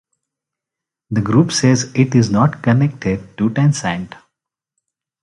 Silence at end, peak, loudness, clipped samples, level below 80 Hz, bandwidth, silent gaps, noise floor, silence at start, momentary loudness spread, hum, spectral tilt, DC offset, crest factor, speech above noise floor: 1.2 s; 0 dBFS; -16 LUFS; under 0.1%; -46 dBFS; 11.5 kHz; none; -85 dBFS; 1.1 s; 9 LU; none; -6 dB/octave; under 0.1%; 16 dB; 70 dB